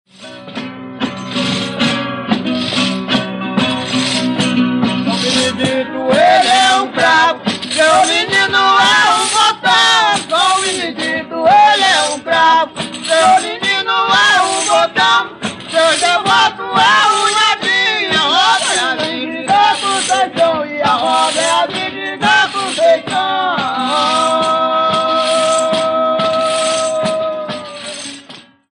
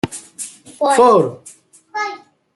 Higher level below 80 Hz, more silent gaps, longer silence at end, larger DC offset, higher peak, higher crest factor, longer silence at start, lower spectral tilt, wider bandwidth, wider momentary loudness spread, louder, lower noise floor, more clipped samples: about the same, -56 dBFS vs -56 dBFS; neither; about the same, 0.35 s vs 0.4 s; neither; about the same, -2 dBFS vs -2 dBFS; about the same, 12 dB vs 16 dB; first, 0.2 s vs 0.05 s; second, -2.5 dB/octave vs -4.5 dB/octave; about the same, 12 kHz vs 12 kHz; second, 10 LU vs 20 LU; first, -12 LUFS vs -15 LUFS; first, -38 dBFS vs -34 dBFS; neither